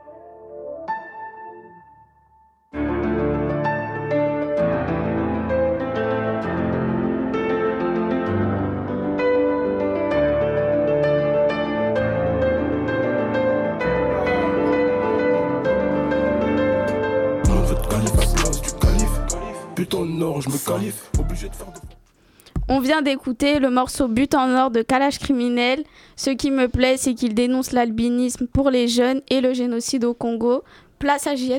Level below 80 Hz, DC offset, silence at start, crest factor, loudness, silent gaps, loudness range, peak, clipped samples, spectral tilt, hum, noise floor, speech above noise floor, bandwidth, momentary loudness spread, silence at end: -32 dBFS; under 0.1%; 0.05 s; 20 dB; -21 LUFS; none; 5 LU; -2 dBFS; under 0.1%; -5.5 dB/octave; none; -56 dBFS; 36 dB; 17.5 kHz; 7 LU; 0 s